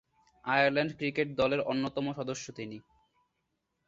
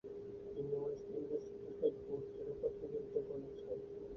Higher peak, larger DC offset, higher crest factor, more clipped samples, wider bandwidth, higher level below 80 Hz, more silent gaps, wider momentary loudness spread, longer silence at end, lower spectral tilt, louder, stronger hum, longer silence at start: first, -12 dBFS vs -24 dBFS; neither; about the same, 22 dB vs 20 dB; neither; first, 7.8 kHz vs 6.2 kHz; about the same, -66 dBFS vs -68 dBFS; neither; first, 16 LU vs 8 LU; first, 1.05 s vs 0 s; second, -5 dB/octave vs -9 dB/octave; first, -31 LUFS vs -44 LUFS; neither; first, 0.45 s vs 0.05 s